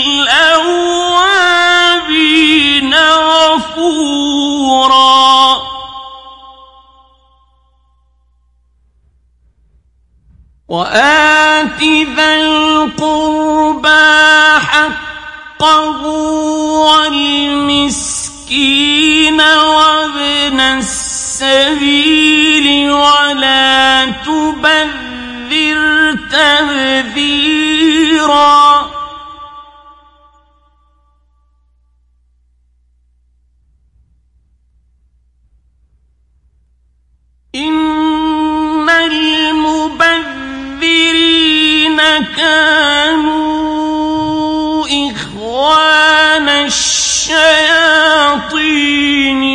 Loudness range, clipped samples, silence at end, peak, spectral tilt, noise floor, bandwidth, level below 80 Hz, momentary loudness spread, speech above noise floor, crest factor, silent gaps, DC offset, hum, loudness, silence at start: 5 LU; under 0.1%; 0 s; 0 dBFS; -1.5 dB/octave; -53 dBFS; 11.5 kHz; -42 dBFS; 9 LU; 44 dB; 12 dB; none; under 0.1%; 60 Hz at -50 dBFS; -9 LUFS; 0 s